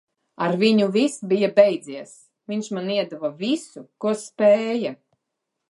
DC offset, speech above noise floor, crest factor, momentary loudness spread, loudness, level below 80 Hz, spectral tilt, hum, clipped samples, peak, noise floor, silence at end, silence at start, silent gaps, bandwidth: under 0.1%; 59 dB; 20 dB; 13 LU; -22 LUFS; -76 dBFS; -5.5 dB/octave; none; under 0.1%; -2 dBFS; -80 dBFS; 0.75 s; 0.4 s; none; 11.5 kHz